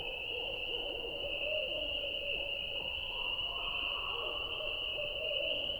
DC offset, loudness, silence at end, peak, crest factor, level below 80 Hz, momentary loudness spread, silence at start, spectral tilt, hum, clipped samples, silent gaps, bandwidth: under 0.1%; -35 LUFS; 0 s; -24 dBFS; 14 dB; -54 dBFS; 3 LU; 0 s; -3.5 dB/octave; none; under 0.1%; none; 19 kHz